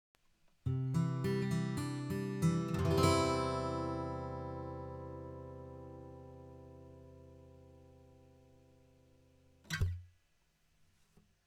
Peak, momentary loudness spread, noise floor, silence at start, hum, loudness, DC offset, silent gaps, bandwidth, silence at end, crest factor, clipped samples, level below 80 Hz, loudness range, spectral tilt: -14 dBFS; 23 LU; -74 dBFS; 0.65 s; none; -37 LUFS; under 0.1%; none; 16.5 kHz; 1.4 s; 24 dB; under 0.1%; -56 dBFS; 21 LU; -6.5 dB/octave